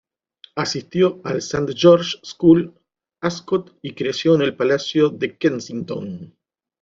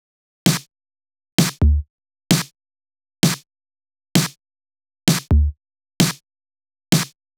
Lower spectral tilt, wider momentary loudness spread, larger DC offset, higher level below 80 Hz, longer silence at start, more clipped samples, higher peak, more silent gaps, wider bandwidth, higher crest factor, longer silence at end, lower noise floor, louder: about the same, -5.5 dB/octave vs -4.5 dB/octave; first, 14 LU vs 8 LU; neither; second, -56 dBFS vs -28 dBFS; about the same, 0.55 s vs 0.45 s; neither; about the same, -2 dBFS vs 0 dBFS; second, none vs 1.32-1.38 s, 1.90-1.98 s; second, 7.6 kHz vs over 20 kHz; about the same, 18 dB vs 22 dB; first, 0.55 s vs 0.3 s; second, -51 dBFS vs under -90 dBFS; about the same, -19 LUFS vs -20 LUFS